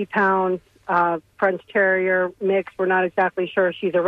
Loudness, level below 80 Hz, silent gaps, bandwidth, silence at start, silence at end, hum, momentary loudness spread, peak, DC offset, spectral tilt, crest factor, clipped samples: -21 LUFS; -64 dBFS; none; 5.2 kHz; 0 s; 0 s; none; 4 LU; -6 dBFS; under 0.1%; -8 dB/octave; 14 dB; under 0.1%